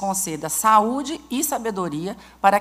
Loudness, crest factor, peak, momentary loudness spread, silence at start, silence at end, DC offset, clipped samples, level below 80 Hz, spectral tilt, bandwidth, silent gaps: -21 LUFS; 20 dB; -2 dBFS; 11 LU; 0 s; 0 s; under 0.1%; under 0.1%; -56 dBFS; -3.5 dB/octave; 16 kHz; none